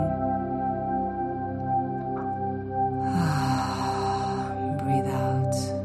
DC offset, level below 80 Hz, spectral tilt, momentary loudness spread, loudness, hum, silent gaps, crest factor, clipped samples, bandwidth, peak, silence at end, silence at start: under 0.1%; -48 dBFS; -6.5 dB/octave; 5 LU; -27 LUFS; none; none; 14 dB; under 0.1%; 13 kHz; -14 dBFS; 0 s; 0 s